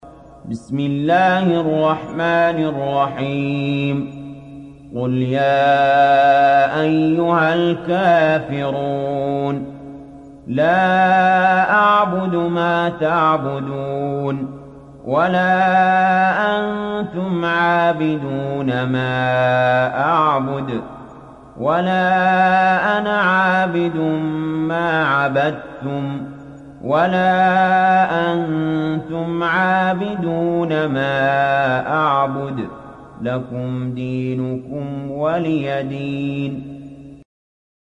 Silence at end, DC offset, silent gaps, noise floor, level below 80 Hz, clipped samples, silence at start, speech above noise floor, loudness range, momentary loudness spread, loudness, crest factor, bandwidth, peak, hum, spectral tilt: 0.8 s; under 0.1%; none; -39 dBFS; -52 dBFS; under 0.1%; 0.05 s; 23 dB; 6 LU; 13 LU; -17 LUFS; 14 dB; 9.4 kHz; -4 dBFS; none; -7.5 dB/octave